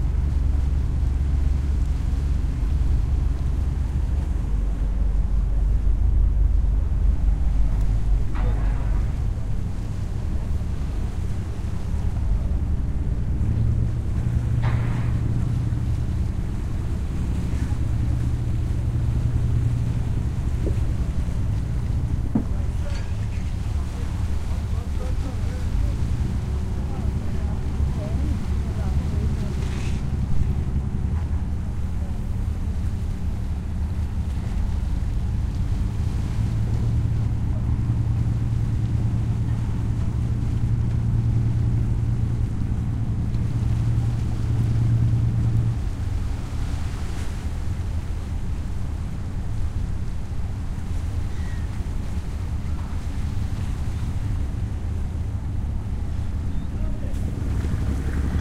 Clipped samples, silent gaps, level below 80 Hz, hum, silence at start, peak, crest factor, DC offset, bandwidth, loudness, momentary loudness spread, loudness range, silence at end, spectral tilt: under 0.1%; none; -26 dBFS; none; 0 s; -8 dBFS; 14 dB; under 0.1%; 11 kHz; -26 LUFS; 6 LU; 5 LU; 0 s; -8 dB/octave